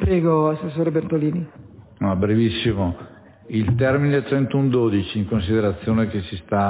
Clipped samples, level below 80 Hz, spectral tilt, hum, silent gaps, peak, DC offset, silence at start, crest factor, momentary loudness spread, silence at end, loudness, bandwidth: under 0.1%; -38 dBFS; -12 dB/octave; none; none; -6 dBFS; under 0.1%; 0 s; 14 dB; 8 LU; 0 s; -21 LUFS; 4 kHz